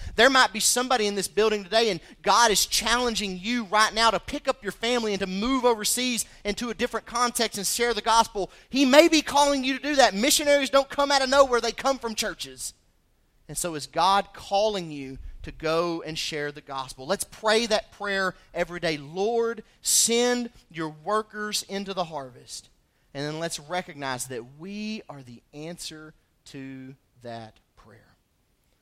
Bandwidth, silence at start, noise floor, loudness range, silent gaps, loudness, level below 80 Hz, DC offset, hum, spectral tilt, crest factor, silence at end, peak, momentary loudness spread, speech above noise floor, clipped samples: 16 kHz; 0 s; -68 dBFS; 13 LU; none; -24 LUFS; -50 dBFS; under 0.1%; none; -2 dB/octave; 24 dB; 1.35 s; -2 dBFS; 18 LU; 43 dB; under 0.1%